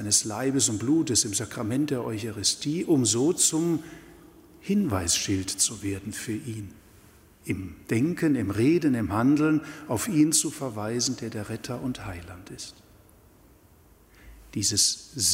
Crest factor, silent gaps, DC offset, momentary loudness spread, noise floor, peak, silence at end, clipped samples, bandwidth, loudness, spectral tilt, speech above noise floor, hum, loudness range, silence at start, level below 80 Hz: 18 dB; none; under 0.1%; 16 LU; -56 dBFS; -8 dBFS; 0 s; under 0.1%; 16 kHz; -25 LUFS; -3.5 dB/octave; 30 dB; none; 9 LU; 0 s; -56 dBFS